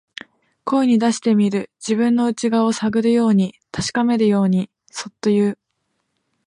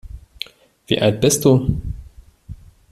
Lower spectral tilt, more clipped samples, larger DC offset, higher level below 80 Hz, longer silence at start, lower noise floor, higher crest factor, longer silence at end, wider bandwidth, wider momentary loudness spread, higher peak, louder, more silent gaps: about the same, -6 dB/octave vs -5 dB/octave; neither; neither; second, -58 dBFS vs -36 dBFS; first, 0.65 s vs 0.05 s; first, -72 dBFS vs -42 dBFS; second, 12 dB vs 18 dB; first, 0.9 s vs 0.35 s; second, 10.5 kHz vs 15 kHz; second, 15 LU vs 18 LU; second, -6 dBFS vs -2 dBFS; about the same, -18 LUFS vs -17 LUFS; neither